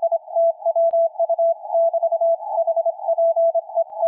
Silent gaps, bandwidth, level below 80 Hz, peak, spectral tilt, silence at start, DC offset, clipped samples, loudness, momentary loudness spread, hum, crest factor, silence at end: none; 1 kHz; under -90 dBFS; -12 dBFS; -5 dB/octave; 0 s; under 0.1%; under 0.1%; -20 LUFS; 4 LU; none; 8 dB; 0 s